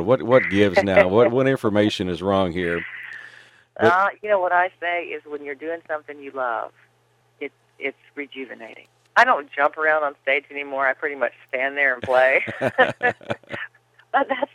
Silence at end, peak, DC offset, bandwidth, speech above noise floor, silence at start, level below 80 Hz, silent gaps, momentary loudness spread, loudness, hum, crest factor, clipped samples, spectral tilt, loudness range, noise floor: 0.1 s; 0 dBFS; under 0.1%; 12 kHz; 41 dB; 0 s; -60 dBFS; none; 18 LU; -21 LUFS; none; 20 dB; under 0.1%; -6 dB/octave; 10 LU; -62 dBFS